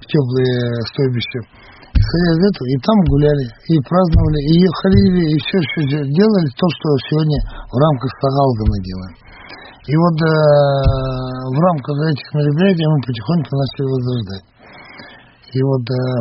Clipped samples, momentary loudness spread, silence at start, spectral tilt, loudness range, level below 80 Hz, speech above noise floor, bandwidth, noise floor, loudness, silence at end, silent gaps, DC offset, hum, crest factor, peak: under 0.1%; 11 LU; 0.1 s; -7 dB/octave; 4 LU; -28 dBFS; 26 dB; 5.8 kHz; -41 dBFS; -16 LUFS; 0 s; none; under 0.1%; none; 14 dB; 0 dBFS